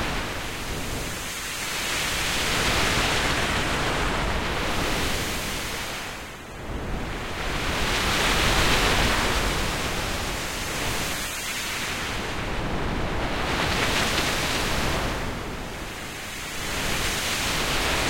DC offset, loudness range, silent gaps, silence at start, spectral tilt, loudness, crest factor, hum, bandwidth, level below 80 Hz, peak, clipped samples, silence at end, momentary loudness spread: under 0.1%; 5 LU; none; 0 s; -3 dB/octave; -25 LUFS; 18 dB; none; 16.5 kHz; -34 dBFS; -8 dBFS; under 0.1%; 0 s; 10 LU